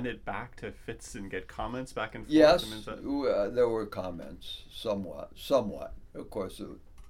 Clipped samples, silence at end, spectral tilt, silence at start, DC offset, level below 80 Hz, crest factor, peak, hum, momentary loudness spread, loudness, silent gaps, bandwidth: under 0.1%; 0 s; -5.5 dB/octave; 0 s; under 0.1%; -50 dBFS; 22 dB; -8 dBFS; none; 18 LU; -30 LUFS; none; 16 kHz